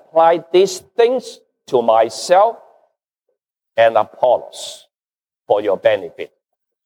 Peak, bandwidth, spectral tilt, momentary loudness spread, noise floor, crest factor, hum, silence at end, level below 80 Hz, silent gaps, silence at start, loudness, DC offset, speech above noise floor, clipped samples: -2 dBFS; 15.5 kHz; -4 dB/octave; 17 LU; under -90 dBFS; 16 dB; none; 0.6 s; -72 dBFS; none; 0.15 s; -16 LUFS; under 0.1%; over 75 dB; under 0.1%